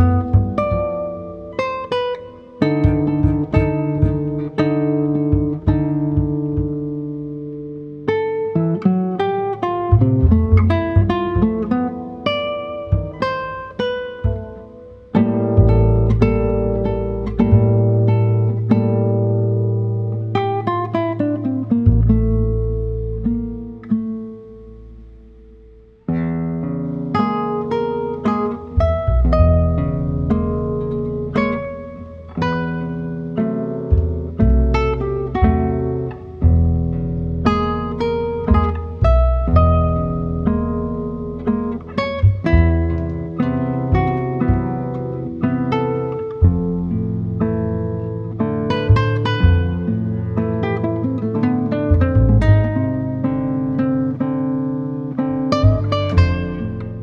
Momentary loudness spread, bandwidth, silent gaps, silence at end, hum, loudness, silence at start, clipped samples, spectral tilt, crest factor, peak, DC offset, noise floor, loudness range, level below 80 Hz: 9 LU; 6.2 kHz; none; 0 s; none; -19 LUFS; 0 s; under 0.1%; -9.5 dB/octave; 16 dB; 0 dBFS; under 0.1%; -44 dBFS; 5 LU; -26 dBFS